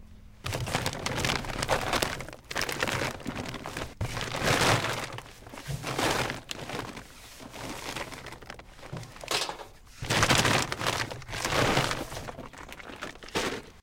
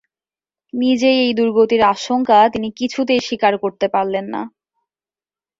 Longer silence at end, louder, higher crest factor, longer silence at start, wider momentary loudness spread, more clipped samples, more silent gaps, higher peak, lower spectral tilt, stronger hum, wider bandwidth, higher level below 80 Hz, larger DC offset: second, 0 s vs 1.1 s; second, -30 LUFS vs -16 LUFS; first, 26 dB vs 16 dB; second, 0 s vs 0.75 s; first, 18 LU vs 10 LU; neither; neither; about the same, -4 dBFS vs -2 dBFS; second, -3 dB/octave vs -4.5 dB/octave; neither; first, 17 kHz vs 7.8 kHz; first, -46 dBFS vs -56 dBFS; neither